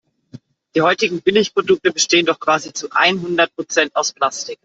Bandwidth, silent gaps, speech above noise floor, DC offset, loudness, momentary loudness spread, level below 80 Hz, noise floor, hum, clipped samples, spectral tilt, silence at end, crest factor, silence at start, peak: 8 kHz; none; 25 dB; under 0.1%; -17 LUFS; 6 LU; -62 dBFS; -42 dBFS; none; under 0.1%; -2.5 dB/octave; 0.1 s; 16 dB; 0.35 s; -2 dBFS